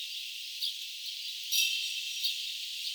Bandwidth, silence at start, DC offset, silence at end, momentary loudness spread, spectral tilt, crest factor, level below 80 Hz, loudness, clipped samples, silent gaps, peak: over 20 kHz; 0 s; under 0.1%; 0 s; 10 LU; 12.5 dB/octave; 20 dB; under -90 dBFS; -32 LUFS; under 0.1%; none; -14 dBFS